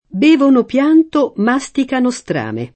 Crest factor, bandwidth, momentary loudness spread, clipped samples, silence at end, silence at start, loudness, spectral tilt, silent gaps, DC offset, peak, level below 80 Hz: 12 dB; 8.8 kHz; 9 LU; under 0.1%; 0.1 s; 0.15 s; -14 LUFS; -5.5 dB/octave; none; under 0.1%; -2 dBFS; -54 dBFS